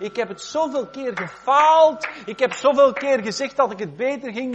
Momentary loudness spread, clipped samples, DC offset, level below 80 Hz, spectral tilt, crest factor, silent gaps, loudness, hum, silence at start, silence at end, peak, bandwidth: 13 LU; under 0.1%; under 0.1%; -64 dBFS; -4 dB/octave; 16 dB; none; -20 LUFS; none; 0 s; 0 s; -4 dBFS; 8.4 kHz